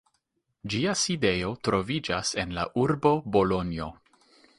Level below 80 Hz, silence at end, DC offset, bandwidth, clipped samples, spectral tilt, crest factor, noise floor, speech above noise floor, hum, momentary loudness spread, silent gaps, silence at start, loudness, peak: -50 dBFS; 0.65 s; under 0.1%; 11.5 kHz; under 0.1%; -4.5 dB/octave; 20 dB; -76 dBFS; 49 dB; none; 9 LU; none; 0.65 s; -27 LUFS; -8 dBFS